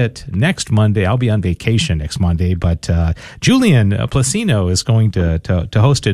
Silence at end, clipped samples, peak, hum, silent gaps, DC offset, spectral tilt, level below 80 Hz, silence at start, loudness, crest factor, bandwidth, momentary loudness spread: 0 s; under 0.1%; -2 dBFS; none; none; under 0.1%; -5.5 dB/octave; -28 dBFS; 0 s; -15 LUFS; 12 dB; 13 kHz; 5 LU